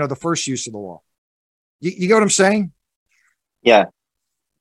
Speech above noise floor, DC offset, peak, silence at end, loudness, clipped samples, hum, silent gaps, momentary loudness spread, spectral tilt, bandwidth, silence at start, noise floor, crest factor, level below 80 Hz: 63 dB; under 0.1%; 0 dBFS; 0.75 s; -17 LUFS; under 0.1%; none; 1.18-1.79 s, 2.96-3.06 s; 15 LU; -4 dB/octave; 12.5 kHz; 0 s; -80 dBFS; 20 dB; -64 dBFS